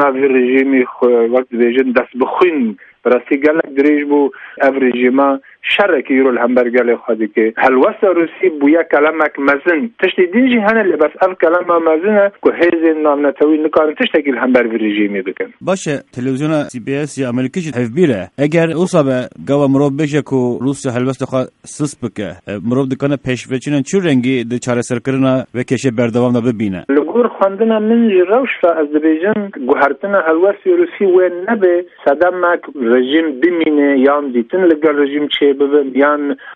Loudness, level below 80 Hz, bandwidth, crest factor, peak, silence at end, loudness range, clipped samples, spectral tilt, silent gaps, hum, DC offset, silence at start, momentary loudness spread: -14 LUFS; -56 dBFS; 11 kHz; 14 dB; 0 dBFS; 0 s; 4 LU; under 0.1%; -6 dB/octave; none; none; under 0.1%; 0 s; 7 LU